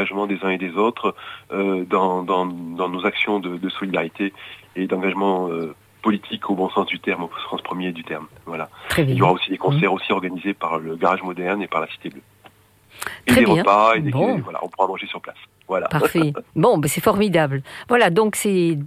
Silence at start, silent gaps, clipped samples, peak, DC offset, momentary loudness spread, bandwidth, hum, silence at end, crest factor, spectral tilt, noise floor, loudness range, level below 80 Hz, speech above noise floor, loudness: 0 s; none; under 0.1%; -4 dBFS; under 0.1%; 14 LU; 16 kHz; none; 0 s; 18 dB; -5.5 dB/octave; -51 dBFS; 5 LU; -54 dBFS; 30 dB; -21 LUFS